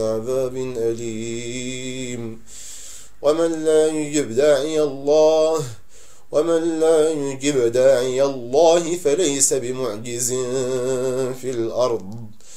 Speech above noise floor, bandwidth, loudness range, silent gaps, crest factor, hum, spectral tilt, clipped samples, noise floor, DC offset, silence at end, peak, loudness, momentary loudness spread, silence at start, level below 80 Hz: 31 dB; 16 kHz; 5 LU; none; 18 dB; none; -4 dB/octave; under 0.1%; -50 dBFS; 2%; 0 s; -2 dBFS; -20 LUFS; 13 LU; 0 s; -56 dBFS